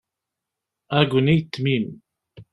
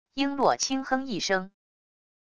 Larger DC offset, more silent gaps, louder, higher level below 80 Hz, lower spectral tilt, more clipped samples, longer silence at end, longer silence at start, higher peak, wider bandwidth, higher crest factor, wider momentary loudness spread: neither; neither; first, -21 LUFS vs -27 LUFS; first, -54 dBFS vs -62 dBFS; first, -8 dB/octave vs -3 dB/octave; neither; second, 0.1 s vs 0.7 s; first, 0.9 s vs 0.05 s; first, -2 dBFS vs -8 dBFS; about the same, 11 kHz vs 10 kHz; about the same, 20 dB vs 20 dB; about the same, 7 LU vs 5 LU